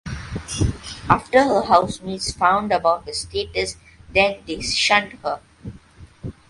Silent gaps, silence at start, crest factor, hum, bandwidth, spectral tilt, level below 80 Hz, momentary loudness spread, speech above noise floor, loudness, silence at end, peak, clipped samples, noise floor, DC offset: none; 0.05 s; 20 dB; none; 11.5 kHz; -4 dB/octave; -40 dBFS; 17 LU; 25 dB; -20 LUFS; 0.2 s; 0 dBFS; under 0.1%; -45 dBFS; under 0.1%